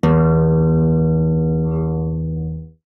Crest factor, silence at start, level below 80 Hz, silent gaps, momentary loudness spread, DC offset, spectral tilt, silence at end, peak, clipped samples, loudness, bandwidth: 10 dB; 0.05 s; -30 dBFS; none; 11 LU; under 0.1%; -10.5 dB/octave; 0.2 s; -6 dBFS; under 0.1%; -17 LUFS; 3.5 kHz